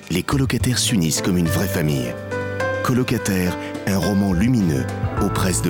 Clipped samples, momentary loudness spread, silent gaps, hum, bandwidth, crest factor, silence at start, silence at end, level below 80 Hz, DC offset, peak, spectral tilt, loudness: under 0.1%; 6 LU; none; none; over 20 kHz; 10 dB; 0 s; 0 s; -38 dBFS; under 0.1%; -8 dBFS; -5 dB/octave; -20 LUFS